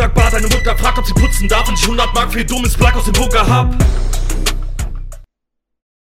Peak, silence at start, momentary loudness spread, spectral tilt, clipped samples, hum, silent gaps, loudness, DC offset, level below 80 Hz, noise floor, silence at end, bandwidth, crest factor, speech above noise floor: 0 dBFS; 0 s; 8 LU; -4 dB/octave; under 0.1%; none; none; -14 LUFS; under 0.1%; -16 dBFS; -74 dBFS; 0.85 s; 16 kHz; 12 dB; 62 dB